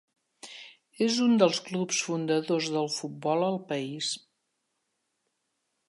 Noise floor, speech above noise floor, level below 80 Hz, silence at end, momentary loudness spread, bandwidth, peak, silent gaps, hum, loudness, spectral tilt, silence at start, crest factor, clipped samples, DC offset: -79 dBFS; 52 dB; -82 dBFS; 1.7 s; 20 LU; 11.5 kHz; -8 dBFS; none; none; -28 LUFS; -4 dB/octave; 0.45 s; 22 dB; under 0.1%; under 0.1%